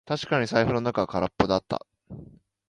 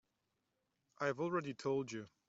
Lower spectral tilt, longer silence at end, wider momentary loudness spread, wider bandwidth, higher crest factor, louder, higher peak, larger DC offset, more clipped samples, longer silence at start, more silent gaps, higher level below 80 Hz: about the same, -6 dB/octave vs -5 dB/octave; first, 0.45 s vs 0.2 s; first, 21 LU vs 3 LU; first, 11 kHz vs 8 kHz; about the same, 22 dB vs 20 dB; first, -26 LUFS vs -40 LUFS; first, -4 dBFS vs -24 dBFS; neither; neither; second, 0.05 s vs 1 s; neither; first, -50 dBFS vs -82 dBFS